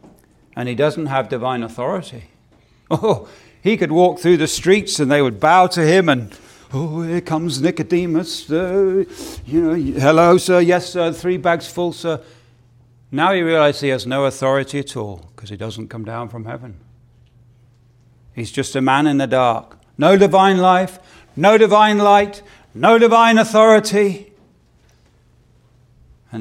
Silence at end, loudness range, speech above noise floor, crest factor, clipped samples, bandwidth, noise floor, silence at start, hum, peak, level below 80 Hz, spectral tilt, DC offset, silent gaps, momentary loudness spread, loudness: 0 s; 10 LU; 38 dB; 16 dB; under 0.1%; 16.5 kHz; -54 dBFS; 0.55 s; none; 0 dBFS; -50 dBFS; -5.5 dB/octave; under 0.1%; none; 17 LU; -15 LUFS